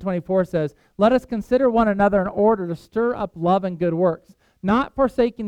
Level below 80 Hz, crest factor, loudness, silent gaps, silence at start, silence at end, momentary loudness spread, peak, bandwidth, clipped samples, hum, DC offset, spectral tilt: -46 dBFS; 16 dB; -21 LUFS; none; 0 s; 0 s; 7 LU; -4 dBFS; 10.5 kHz; under 0.1%; none; under 0.1%; -8.5 dB/octave